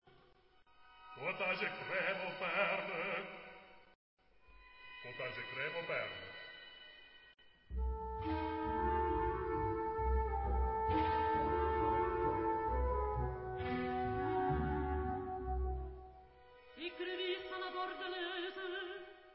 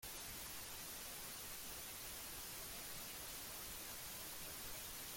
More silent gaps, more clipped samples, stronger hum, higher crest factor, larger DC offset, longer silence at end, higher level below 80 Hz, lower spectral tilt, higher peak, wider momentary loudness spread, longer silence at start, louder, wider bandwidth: first, 3.95-4.17 s vs none; neither; neither; first, 20 dB vs 14 dB; neither; about the same, 0 s vs 0 s; first, -46 dBFS vs -66 dBFS; first, -4 dB/octave vs -1 dB/octave; first, -20 dBFS vs -36 dBFS; first, 16 LU vs 0 LU; about the same, 0.05 s vs 0 s; first, -39 LUFS vs -48 LUFS; second, 5.6 kHz vs 17 kHz